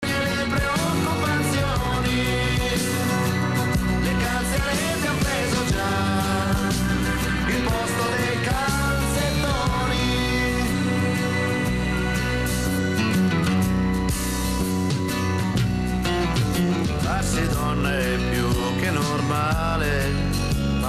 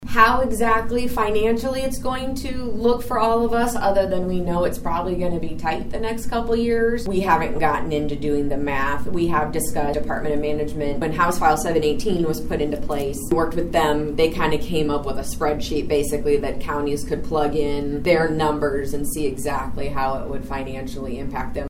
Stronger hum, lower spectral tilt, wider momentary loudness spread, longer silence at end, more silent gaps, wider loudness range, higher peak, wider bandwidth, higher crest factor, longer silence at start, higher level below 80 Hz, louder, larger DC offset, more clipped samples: neither; about the same, -5 dB/octave vs -5.5 dB/octave; second, 2 LU vs 7 LU; about the same, 0 s vs 0 s; neither; about the same, 1 LU vs 2 LU; second, -12 dBFS vs -2 dBFS; about the same, 15 kHz vs 16.5 kHz; second, 10 dB vs 18 dB; about the same, 0 s vs 0 s; about the same, -32 dBFS vs -32 dBFS; about the same, -23 LUFS vs -22 LUFS; first, 0.3% vs under 0.1%; neither